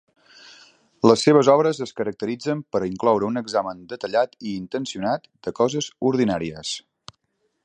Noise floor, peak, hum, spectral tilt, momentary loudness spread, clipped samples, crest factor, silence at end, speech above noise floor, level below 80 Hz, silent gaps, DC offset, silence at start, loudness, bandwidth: -71 dBFS; 0 dBFS; none; -5.5 dB/octave; 15 LU; under 0.1%; 22 dB; 0.85 s; 50 dB; -60 dBFS; none; under 0.1%; 0.45 s; -22 LUFS; 9.6 kHz